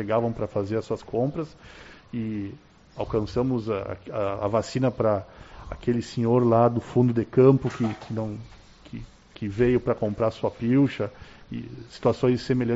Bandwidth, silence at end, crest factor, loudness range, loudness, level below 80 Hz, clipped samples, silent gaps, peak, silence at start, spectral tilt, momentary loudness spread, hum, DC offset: 8 kHz; 0 s; 18 dB; 7 LU; -25 LUFS; -50 dBFS; under 0.1%; none; -6 dBFS; 0 s; -7.5 dB/octave; 18 LU; none; under 0.1%